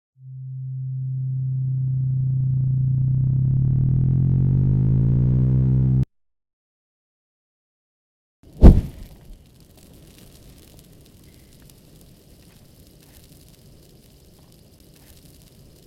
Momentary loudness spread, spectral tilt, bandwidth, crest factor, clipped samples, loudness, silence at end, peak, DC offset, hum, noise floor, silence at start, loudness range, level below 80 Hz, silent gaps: 14 LU; -10 dB/octave; 4.9 kHz; 22 dB; under 0.1%; -20 LUFS; 6.5 s; 0 dBFS; under 0.1%; none; -50 dBFS; 0.25 s; 4 LU; -28 dBFS; 6.53-8.43 s